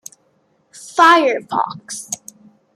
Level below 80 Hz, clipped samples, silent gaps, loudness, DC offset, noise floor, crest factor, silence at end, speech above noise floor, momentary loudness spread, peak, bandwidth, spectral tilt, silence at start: -72 dBFS; under 0.1%; none; -15 LUFS; under 0.1%; -61 dBFS; 18 dB; 0.6 s; 46 dB; 18 LU; 0 dBFS; 15.5 kHz; -2 dB/octave; 0.85 s